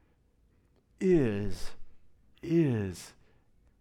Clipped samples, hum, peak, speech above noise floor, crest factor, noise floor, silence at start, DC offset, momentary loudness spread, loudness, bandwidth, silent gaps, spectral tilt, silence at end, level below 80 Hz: under 0.1%; none; -16 dBFS; 39 dB; 16 dB; -67 dBFS; 1 s; under 0.1%; 20 LU; -30 LUFS; 13 kHz; none; -7.5 dB/octave; 0.7 s; -48 dBFS